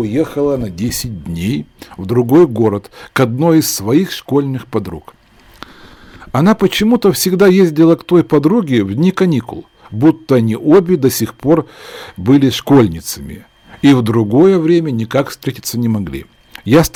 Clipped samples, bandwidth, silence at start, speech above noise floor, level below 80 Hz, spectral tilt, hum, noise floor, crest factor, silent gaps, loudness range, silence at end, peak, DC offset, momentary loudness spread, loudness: under 0.1%; 19.5 kHz; 0 s; 26 dB; -42 dBFS; -6 dB/octave; none; -39 dBFS; 12 dB; none; 4 LU; 0.05 s; 0 dBFS; under 0.1%; 14 LU; -13 LUFS